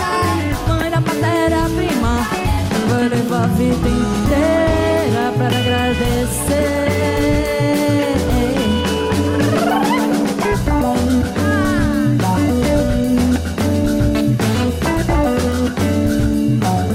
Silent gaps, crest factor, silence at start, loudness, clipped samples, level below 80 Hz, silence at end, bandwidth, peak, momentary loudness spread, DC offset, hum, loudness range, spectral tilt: none; 10 dB; 0 s; -16 LUFS; under 0.1%; -26 dBFS; 0 s; 16 kHz; -4 dBFS; 2 LU; under 0.1%; none; 1 LU; -6 dB/octave